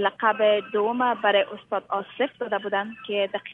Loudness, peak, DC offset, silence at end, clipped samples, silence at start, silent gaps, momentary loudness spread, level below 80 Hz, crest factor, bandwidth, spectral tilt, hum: -25 LUFS; -6 dBFS; under 0.1%; 0 s; under 0.1%; 0 s; none; 8 LU; -74 dBFS; 18 dB; 4 kHz; -6.5 dB/octave; none